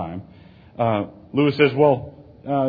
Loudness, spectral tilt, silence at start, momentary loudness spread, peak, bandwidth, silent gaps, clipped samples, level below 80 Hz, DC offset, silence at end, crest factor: -20 LUFS; -9.5 dB/octave; 0 s; 21 LU; -4 dBFS; 5 kHz; none; under 0.1%; -54 dBFS; under 0.1%; 0 s; 18 dB